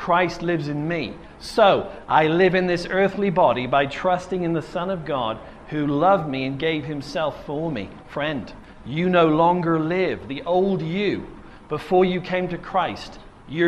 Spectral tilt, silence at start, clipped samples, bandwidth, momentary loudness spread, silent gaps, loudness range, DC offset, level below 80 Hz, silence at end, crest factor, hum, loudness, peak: -7 dB/octave; 0 s; under 0.1%; 11 kHz; 14 LU; none; 4 LU; under 0.1%; -48 dBFS; 0 s; 20 dB; none; -22 LUFS; -2 dBFS